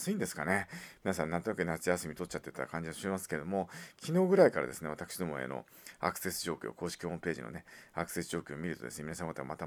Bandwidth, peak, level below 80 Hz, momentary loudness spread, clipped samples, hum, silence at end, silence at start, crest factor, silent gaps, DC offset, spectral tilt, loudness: over 20 kHz; -10 dBFS; -64 dBFS; 12 LU; under 0.1%; none; 0 s; 0 s; 24 dB; none; under 0.1%; -5 dB/octave; -35 LUFS